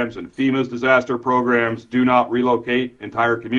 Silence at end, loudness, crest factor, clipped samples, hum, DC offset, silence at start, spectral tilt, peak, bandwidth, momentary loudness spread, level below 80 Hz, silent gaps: 0 s; -19 LUFS; 16 dB; under 0.1%; none; under 0.1%; 0 s; -6.5 dB/octave; -2 dBFS; 7.2 kHz; 6 LU; -58 dBFS; none